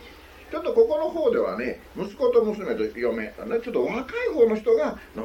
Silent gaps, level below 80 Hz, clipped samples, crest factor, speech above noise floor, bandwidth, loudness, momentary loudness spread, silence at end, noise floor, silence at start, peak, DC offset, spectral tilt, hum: none; -52 dBFS; under 0.1%; 16 dB; 22 dB; 7.2 kHz; -24 LUFS; 10 LU; 0 s; -46 dBFS; 0 s; -8 dBFS; under 0.1%; -6.5 dB/octave; none